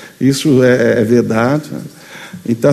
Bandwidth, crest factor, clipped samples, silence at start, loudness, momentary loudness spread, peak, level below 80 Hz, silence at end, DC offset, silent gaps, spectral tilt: 13.5 kHz; 12 dB; under 0.1%; 0 s; -12 LUFS; 20 LU; 0 dBFS; -50 dBFS; 0 s; under 0.1%; none; -6 dB/octave